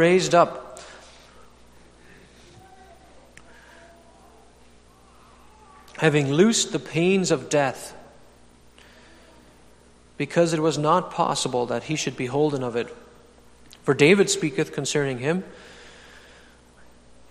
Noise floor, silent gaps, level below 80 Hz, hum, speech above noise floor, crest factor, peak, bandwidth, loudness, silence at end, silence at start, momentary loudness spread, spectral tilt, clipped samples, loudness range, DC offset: -53 dBFS; none; -58 dBFS; 60 Hz at -55 dBFS; 31 dB; 22 dB; -4 dBFS; 14 kHz; -22 LUFS; 1.4 s; 0 s; 22 LU; -4.5 dB/octave; under 0.1%; 6 LU; under 0.1%